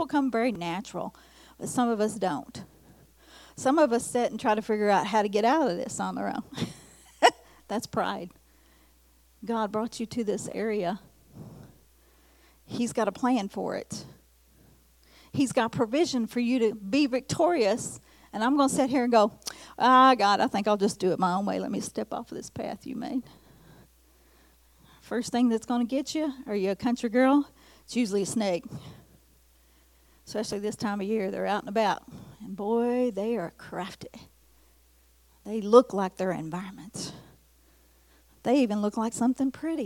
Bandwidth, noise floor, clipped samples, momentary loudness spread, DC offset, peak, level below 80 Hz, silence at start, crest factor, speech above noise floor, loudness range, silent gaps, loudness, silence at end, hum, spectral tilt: 17.5 kHz; -61 dBFS; under 0.1%; 16 LU; under 0.1%; -6 dBFS; -62 dBFS; 0 s; 24 dB; 34 dB; 9 LU; none; -27 LUFS; 0 s; none; -5 dB/octave